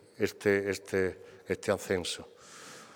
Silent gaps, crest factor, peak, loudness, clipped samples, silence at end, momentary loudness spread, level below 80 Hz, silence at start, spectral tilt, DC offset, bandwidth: none; 20 dB; -14 dBFS; -32 LUFS; under 0.1%; 0 s; 20 LU; -66 dBFS; 0.2 s; -4.5 dB/octave; under 0.1%; 18.5 kHz